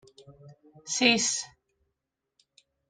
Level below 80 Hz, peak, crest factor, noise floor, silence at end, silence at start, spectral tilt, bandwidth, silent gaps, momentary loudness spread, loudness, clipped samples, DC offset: -72 dBFS; -6 dBFS; 26 dB; -84 dBFS; 1.45 s; 0.3 s; -1.5 dB/octave; 10 kHz; none; 23 LU; -25 LUFS; under 0.1%; under 0.1%